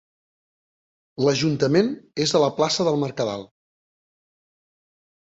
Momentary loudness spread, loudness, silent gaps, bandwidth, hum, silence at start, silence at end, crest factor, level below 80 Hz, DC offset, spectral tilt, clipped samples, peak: 8 LU; -22 LUFS; none; 8.4 kHz; none; 1.2 s; 1.8 s; 20 dB; -62 dBFS; under 0.1%; -5 dB/octave; under 0.1%; -6 dBFS